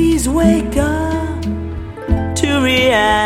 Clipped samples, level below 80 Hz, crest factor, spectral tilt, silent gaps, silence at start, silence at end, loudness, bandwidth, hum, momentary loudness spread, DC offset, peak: under 0.1%; -26 dBFS; 14 dB; -5 dB/octave; none; 0 s; 0 s; -15 LUFS; 16 kHz; none; 11 LU; under 0.1%; 0 dBFS